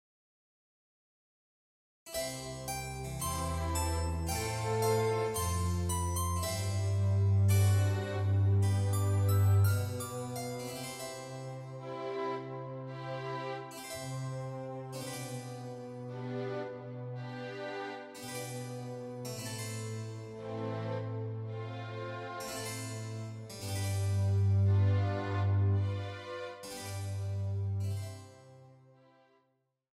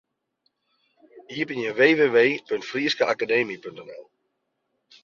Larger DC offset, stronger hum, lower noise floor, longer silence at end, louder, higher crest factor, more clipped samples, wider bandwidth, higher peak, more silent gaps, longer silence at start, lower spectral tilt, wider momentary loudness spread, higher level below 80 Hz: neither; neither; about the same, -78 dBFS vs -76 dBFS; first, 1.25 s vs 1 s; second, -35 LUFS vs -22 LUFS; about the same, 16 dB vs 20 dB; neither; first, 16 kHz vs 7.2 kHz; second, -18 dBFS vs -6 dBFS; neither; first, 2.05 s vs 1.15 s; about the same, -5.5 dB/octave vs -4.5 dB/octave; second, 14 LU vs 20 LU; first, -52 dBFS vs -72 dBFS